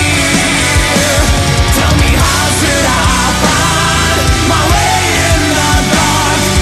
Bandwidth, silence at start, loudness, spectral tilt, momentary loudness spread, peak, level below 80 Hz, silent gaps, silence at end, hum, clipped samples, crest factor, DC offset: 14 kHz; 0 s; -9 LUFS; -3.5 dB/octave; 1 LU; 0 dBFS; -18 dBFS; none; 0 s; none; under 0.1%; 10 dB; 0.1%